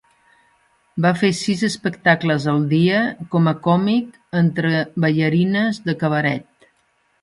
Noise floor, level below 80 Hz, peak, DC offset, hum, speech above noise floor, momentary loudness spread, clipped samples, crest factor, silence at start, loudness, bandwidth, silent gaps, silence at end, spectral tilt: -63 dBFS; -60 dBFS; -2 dBFS; under 0.1%; none; 45 dB; 5 LU; under 0.1%; 18 dB; 0.95 s; -19 LUFS; 11.5 kHz; none; 0.8 s; -6.5 dB/octave